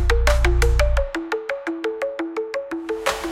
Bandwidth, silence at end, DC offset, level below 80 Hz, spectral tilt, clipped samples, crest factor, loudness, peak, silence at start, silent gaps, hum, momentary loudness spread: 15 kHz; 0 s; under 0.1%; -22 dBFS; -5 dB/octave; under 0.1%; 18 dB; -23 LUFS; -4 dBFS; 0 s; none; none; 9 LU